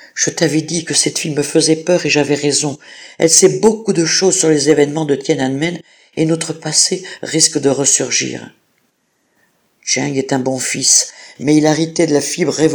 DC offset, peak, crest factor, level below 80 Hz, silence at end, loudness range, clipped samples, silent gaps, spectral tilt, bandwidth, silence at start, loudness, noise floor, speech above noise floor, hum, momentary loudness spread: under 0.1%; 0 dBFS; 16 dB; -58 dBFS; 0 s; 4 LU; 0.1%; none; -3 dB/octave; over 20 kHz; 0 s; -14 LUFS; -63 dBFS; 49 dB; none; 10 LU